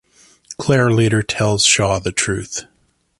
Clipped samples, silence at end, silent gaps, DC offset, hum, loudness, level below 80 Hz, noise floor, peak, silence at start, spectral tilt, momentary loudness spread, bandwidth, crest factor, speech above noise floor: under 0.1%; 0.55 s; none; under 0.1%; none; -16 LUFS; -42 dBFS; -42 dBFS; -2 dBFS; 0.5 s; -3.5 dB/octave; 14 LU; 11.5 kHz; 16 dB; 26 dB